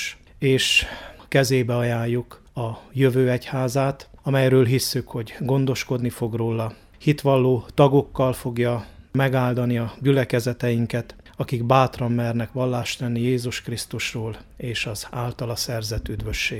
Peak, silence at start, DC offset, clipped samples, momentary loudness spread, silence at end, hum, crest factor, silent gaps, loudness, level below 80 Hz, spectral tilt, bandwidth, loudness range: -2 dBFS; 0 s; under 0.1%; under 0.1%; 12 LU; 0 s; none; 20 dB; none; -23 LUFS; -44 dBFS; -5.5 dB/octave; 16 kHz; 5 LU